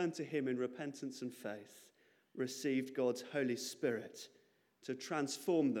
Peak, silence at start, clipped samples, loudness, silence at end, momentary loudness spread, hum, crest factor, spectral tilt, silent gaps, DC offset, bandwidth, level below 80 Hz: -22 dBFS; 0 s; under 0.1%; -40 LUFS; 0 s; 16 LU; none; 18 dB; -4.5 dB/octave; none; under 0.1%; 17.5 kHz; under -90 dBFS